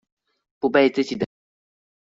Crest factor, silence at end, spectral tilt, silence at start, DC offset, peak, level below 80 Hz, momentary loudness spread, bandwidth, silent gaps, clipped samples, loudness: 22 dB; 0.95 s; -3.5 dB/octave; 0.65 s; under 0.1%; -4 dBFS; -66 dBFS; 11 LU; 7.8 kHz; none; under 0.1%; -22 LUFS